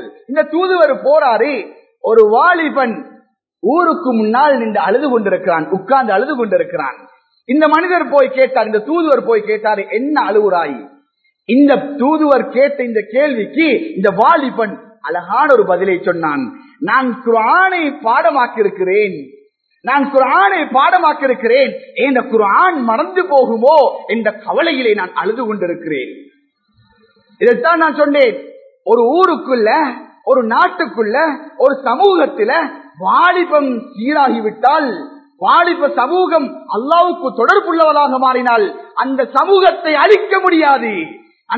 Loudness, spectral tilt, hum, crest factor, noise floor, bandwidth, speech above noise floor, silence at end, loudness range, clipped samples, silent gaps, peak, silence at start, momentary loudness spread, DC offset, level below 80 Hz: -13 LUFS; -7 dB/octave; none; 14 dB; -59 dBFS; 6.6 kHz; 47 dB; 0 s; 3 LU; under 0.1%; none; 0 dBFS; 0 s; 9 LU; under 0.1%; -68 dBFS